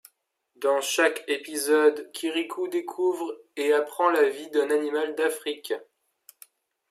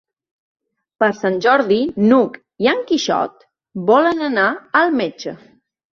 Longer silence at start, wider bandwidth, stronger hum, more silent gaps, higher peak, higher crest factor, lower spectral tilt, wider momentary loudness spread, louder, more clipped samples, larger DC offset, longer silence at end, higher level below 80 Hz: second, 0.6 s vs 1 s; first, 15.5 kHz vs 7.4 kHz; neither; neither; second, -8 dBFS vs 0 dBFS; about the same, 18 dB vs 18 dB; second, -1 dB/octave vs -5 dB/octave; about the same, 11 LU vs 10 LU; second, -26 LUFS vs -17 LUFS; neither; neither; first, 1.05 s vs 0.55 s; second, -86 dBFS vs -60 dBFS